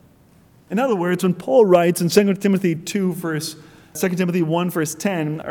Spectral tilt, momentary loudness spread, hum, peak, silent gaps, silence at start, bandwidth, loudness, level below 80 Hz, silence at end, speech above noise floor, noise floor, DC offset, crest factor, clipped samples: -6 dB/octave; 10 LU; none; -2 dBFS; none; 0.7 s; 19 kHz; -19 LUFS; -62 dBFS; 0 s; 33 dB; -52 dBFS; under 0.1%; 18 dB; under 0.1%